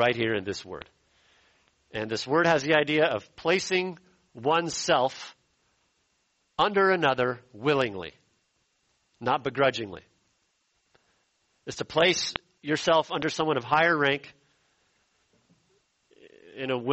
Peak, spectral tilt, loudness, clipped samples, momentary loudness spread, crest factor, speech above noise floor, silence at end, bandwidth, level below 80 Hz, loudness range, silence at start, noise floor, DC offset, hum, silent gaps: -4 dBFS; -4 dB/octave; -26 LUFS; under 0.1%; 17 LU; 24 dB; 47 dB; 0 s; 8.2 kHz; -64 dBFS; 5 LU; 0 s; -73 dBFS; under 0.1%; none; none